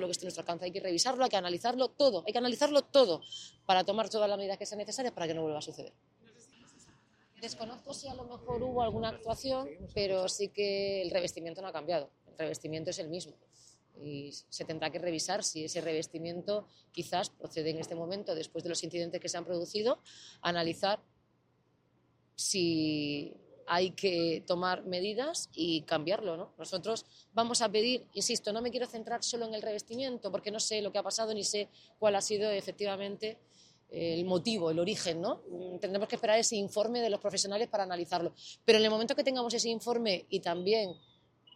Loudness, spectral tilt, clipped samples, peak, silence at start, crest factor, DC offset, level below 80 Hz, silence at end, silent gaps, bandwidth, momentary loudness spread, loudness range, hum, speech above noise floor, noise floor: -33 LUFS; -3 dB/octave; under 0.1%; -10 dBFS; 0 s; 24 dB; under 0.1%; -68 dBFS; 0.6 s; none; 14 kHz; 12 LU; 8 LU; none; 38 dB; -72 dBFS